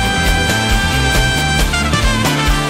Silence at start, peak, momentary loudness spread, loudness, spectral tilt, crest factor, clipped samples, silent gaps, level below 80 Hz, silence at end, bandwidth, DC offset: 0 s; -2 dBFS; 1 LU; -14 LUFS; -3.5 dB/octave; 10 dB; under 0.1%; none; -20 dBFS; 0 s; 16 kHz; under 0.1%